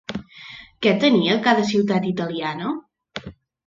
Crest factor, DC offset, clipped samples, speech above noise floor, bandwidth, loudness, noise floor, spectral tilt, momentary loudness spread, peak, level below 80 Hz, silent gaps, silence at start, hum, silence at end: 18 dB; under 0.1%; under 0.1%; 23 dB; 7.6 kHz; -20 LUFS; -42 dBFS; -6 dB/octave; 20 LU; -2 dBFS; -58 dBFS; none; 0.1 s; none; 0.35 s